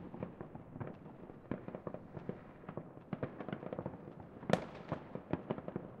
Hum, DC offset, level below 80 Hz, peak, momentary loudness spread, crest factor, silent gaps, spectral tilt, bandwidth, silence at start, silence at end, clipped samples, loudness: none; under 0.1%; -68 dBFS; -14 dBFS; 14 LU; 32 dB; none; -7.5 dB/octave; 9.4 kHz; 0 s; 0 s; under 0.1%; -45 LUFS